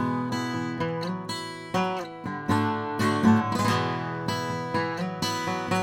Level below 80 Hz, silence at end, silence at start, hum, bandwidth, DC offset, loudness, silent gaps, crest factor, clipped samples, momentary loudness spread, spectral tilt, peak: -60 dBFS; 0 s; 0 s; none; 17 kHz; under 0.1%; -27 LUFS; none; 18 dB; under 0.1%; 9 LU; -5.5 dB/octave; -8 dBFS